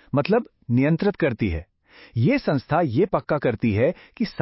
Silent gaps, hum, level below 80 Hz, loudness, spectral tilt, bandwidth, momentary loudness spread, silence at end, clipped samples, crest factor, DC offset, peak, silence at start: none; none; -42 dBFS; -23 LUFS; -12 dB/octave; 5.8 kHz; 7 LU; 0 s; under 0.1%; 16 dB; under 0.1%; -6 dBFS; 0.15 s